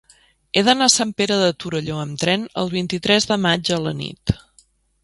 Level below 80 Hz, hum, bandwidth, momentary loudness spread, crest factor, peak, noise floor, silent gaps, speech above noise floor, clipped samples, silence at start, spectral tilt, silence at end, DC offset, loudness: -46 dBFS; none; 11.5 kHz; 11 LU; 20 dB; 0 dBFS; -57 dBFS; none; 38 dB; under 0.1%; 0.55 s; -3.5 dB/octave; 0.65 s; under 0.1%; -19 LUFS